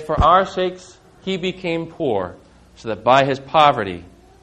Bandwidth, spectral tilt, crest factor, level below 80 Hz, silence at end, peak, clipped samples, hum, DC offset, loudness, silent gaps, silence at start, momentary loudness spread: 9.6 kHz; -6 dB/octave; 20 dB; -38 dBFS; 0.35 s; 0 dBFS; under 0.1%; none; under 0.1%; -18 LUFS; none; 0 s; 17 LU